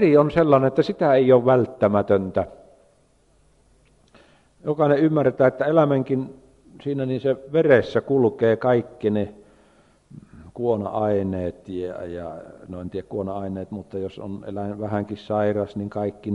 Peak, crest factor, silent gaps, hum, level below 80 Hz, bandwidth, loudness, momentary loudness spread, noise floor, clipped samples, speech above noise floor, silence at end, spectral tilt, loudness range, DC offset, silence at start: -4 dBFS; 20 dB; none; none; -56 dBFS; 7.6 kHz; -22 LUFS; 15 LU; -60 dBFS; under 0.1%; 39 dB; 0 s; -9 dB/octave; 9 LU; under 0.1%; 0 s